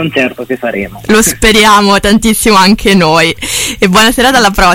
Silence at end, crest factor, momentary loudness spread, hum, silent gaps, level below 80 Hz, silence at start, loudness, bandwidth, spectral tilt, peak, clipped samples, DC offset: 0 s; 8 dB; 10 LU; none; none; -26 dBFS; 0 s; -7 LUFS; 17 kHz; -3.5 dB/octave; 0 dBFS; 0.6%; under 0.1%